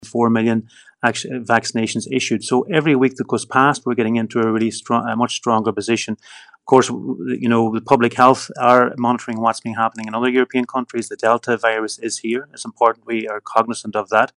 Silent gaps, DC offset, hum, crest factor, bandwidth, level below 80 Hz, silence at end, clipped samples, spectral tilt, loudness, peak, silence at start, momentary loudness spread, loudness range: none; under 0.1%; none; 18 dB; 11 kHz; -66 dBFS; 0.1 s; under 0.1%; -5 dB/octave; -18 LUFS; 0 dBFS; 0 s; 9 LU; 4 LU